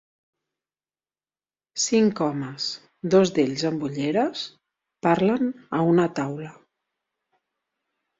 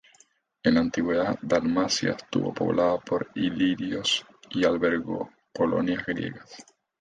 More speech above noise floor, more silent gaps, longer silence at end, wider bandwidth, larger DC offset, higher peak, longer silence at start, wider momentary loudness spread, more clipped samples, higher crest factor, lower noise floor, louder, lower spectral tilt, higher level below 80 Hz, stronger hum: first, over 67 dB vs 36 dB; neither; first, 1.7 s vs 0.4 s; second, 8 kHz vs 9.6 kHz; neither; about the same, -6 dBFS vs -8 dBFS; first, 1.75 s vs 0.65 s; first, 13 LU vs 10 LU; neither; about the same, 20 dB vs 18 dB; first, under -90 dBFS vs -62 dBFS; first, -23 LUFS vs -26 LUFS; about the same, -5 dB/octave vs -4.5 dB/octave; second, -66 dBFS vs -56 dBFS; neither